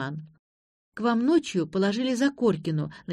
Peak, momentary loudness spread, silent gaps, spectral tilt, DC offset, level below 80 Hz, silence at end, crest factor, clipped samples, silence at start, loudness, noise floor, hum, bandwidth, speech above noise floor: -10 dBFS; 11 LU; 0.39-0.92 s; -6 dB/octave; under 0.1%; -66 dBFS; 0 s; 16 dB; under 0.1%; 0 s; -26 LUFS; under -90 dBFS; none; 12 kHz; over 65 dB